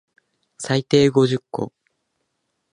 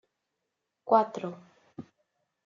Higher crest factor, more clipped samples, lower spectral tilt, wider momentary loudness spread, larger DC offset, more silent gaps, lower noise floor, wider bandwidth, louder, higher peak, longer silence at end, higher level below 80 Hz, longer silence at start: second, 18 dB vs 24 dB; neither; about the same, -6 dB/octave vs -5.5 dB/octave; second, 16 LU vs 25 LU; neither; neither; second, -74 dBFS vs -84 dBFS; first, 11 kHz vs 7.4 kHz; first, -19 LUFS vs -27 LUFS; first, -4 dBFS vs -8 dBFS; first, 1.05 s vs 0.65 s; first, -60 dBFS vs -84 dBFS; second, 0.6 s vs 0.85 s